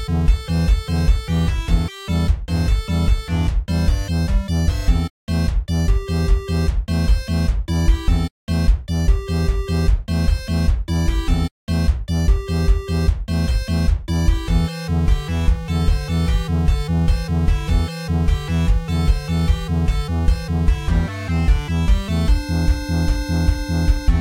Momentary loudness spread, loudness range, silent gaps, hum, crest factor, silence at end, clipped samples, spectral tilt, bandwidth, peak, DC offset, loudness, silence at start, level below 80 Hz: 2 LU; 1 LU; 5.10-5.27 s, 8.31-8.47 s, 11.51-11.67 s; none; 14 dB; 0 s; under 0.1%; -6.5 dB/octave; 15 kHz; -4 dBFS; under 0.1%; -20 LUFS; 0 s; -20 dBFS